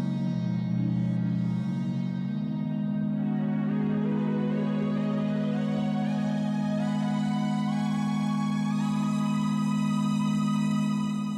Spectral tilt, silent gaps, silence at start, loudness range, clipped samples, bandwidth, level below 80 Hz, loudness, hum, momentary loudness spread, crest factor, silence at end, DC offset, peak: -7.5 dB/octave; none; 0 s; 2 LU; under 0.1%; 10.5 kHz; -64 dBFS; -28 LUFS; none; 3 LU; 10 dB; 0 s; under 0.1%; -18 dBFS